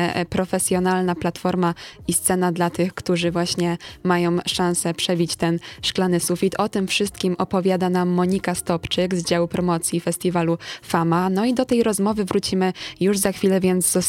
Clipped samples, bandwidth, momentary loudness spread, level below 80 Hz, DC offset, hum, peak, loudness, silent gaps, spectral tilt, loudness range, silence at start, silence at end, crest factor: under 0.1%; 17 kHz; 4 LU; -50 dBFS; under 0.1%; none; -4 dBFS; -21 LUFS; none; -4.5 dB/octave; 1 LU; 0 s; 0 s; 18 dB